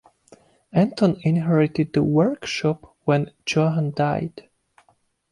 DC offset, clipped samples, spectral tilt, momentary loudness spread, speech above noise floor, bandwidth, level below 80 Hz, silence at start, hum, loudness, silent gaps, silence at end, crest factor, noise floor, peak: under 0.1%; under 0.1%; -7 dB/octave; 6 LU; 43 dB; 11 kHz; -56 dBFS; 0.75 s; none; -22 LUFS; none; 0.9 s; 16 dB; -64 dBFS; -6 dBFS